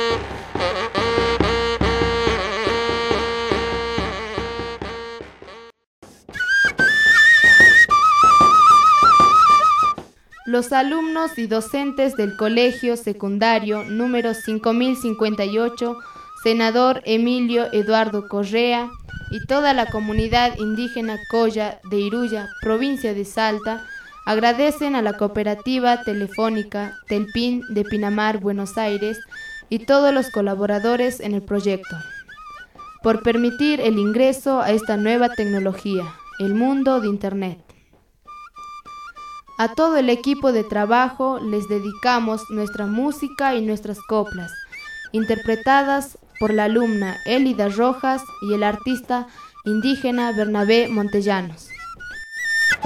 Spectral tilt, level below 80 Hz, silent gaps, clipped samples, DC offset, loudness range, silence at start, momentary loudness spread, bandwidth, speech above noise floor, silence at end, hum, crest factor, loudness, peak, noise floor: -4.5 dB/octave; -42 dBFS; 5.87-6.02 s; under 0.1%; under 0.1%; 10 LU; 0 s; 18 LU; 15 kHz; 36 dB; 0 s; none; 18 dB; -18 LUFS; -2 dBFS; -56 dBFS